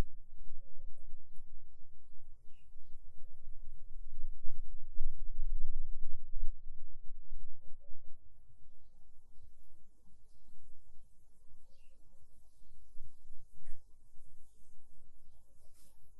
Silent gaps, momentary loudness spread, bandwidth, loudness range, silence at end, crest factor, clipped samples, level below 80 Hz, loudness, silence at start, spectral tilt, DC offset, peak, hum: none; 23 LU; 0.6 kHz; 21 LU; 0 s; 14 dB; under 0.1%; -44 dBFS; -52 LUFS; 0 s; -7.5 dB/octave; under 0.1%; -14 dBFS; none